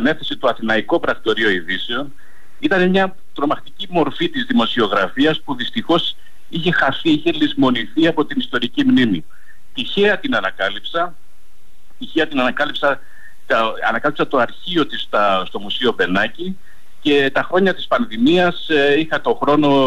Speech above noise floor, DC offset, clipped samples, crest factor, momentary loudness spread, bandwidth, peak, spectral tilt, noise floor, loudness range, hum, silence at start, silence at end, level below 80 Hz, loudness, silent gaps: 37 dB; 5%; under 0.1%; 12 dB; 9 LU; 13.5 kHz; -6 dBFS; -6 dB/octave; -55 dBFS; 3 LU; none; 0 s; 0 s; -52 dBFS; -18 LUFS; none